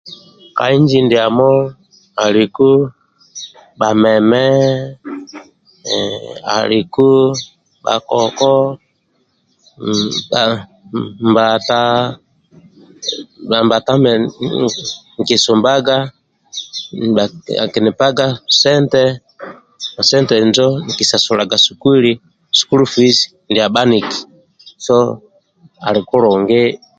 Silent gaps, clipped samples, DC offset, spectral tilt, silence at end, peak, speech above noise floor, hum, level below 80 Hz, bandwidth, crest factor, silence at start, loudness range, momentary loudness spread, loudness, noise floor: none; under 0.1%; under 0.1%; -4.5 dB/octave; 0.25 s; 0 dBFS; 48 dB; none; -54 dBFS; 9.2 kHz; 14 dB; 0.05 s; 4 LU; 16 LU; -13 LUFS; -61 dBFS